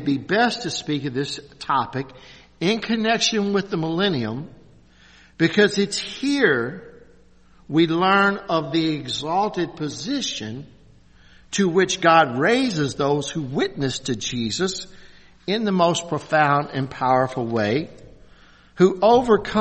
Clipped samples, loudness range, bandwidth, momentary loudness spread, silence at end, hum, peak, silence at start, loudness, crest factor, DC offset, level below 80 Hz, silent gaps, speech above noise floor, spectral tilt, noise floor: under 0.1%; 3 LU; 8.8 kHz; 12 LU; 0 s; none; -2 dBFS; 0 s; -21 LUFS; 20 dB; under 0.1%; -54 dBFS; none; 30 dB; -4.5 dB/octave; -51 dBFS